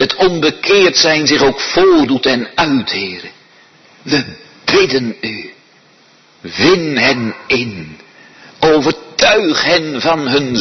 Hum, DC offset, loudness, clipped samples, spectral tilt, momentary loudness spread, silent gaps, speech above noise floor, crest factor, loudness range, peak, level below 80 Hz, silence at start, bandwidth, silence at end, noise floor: none; under 0.1%; -12 LUFS; under 0.1%; -3.5 dB/octave; 14 LU; none; 35 dB; 14 dB; 6 LU; 0 dBFS; -46 dBFS; 0 s; 6.4 kHz; 0 s; -47 dBFS